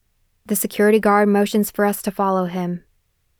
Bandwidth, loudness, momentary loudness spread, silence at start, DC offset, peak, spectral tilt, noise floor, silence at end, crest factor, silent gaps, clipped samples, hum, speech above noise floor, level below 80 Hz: over 20 kHz; -19 LUFS; 10 LU; 0.5 s; under 0.1%; -4 dBFS; -5.5 dB/octave; -65 dBFS; 0.6 s; 16 dB; none; under 0.1%; none; 47 dB; -58 dBFS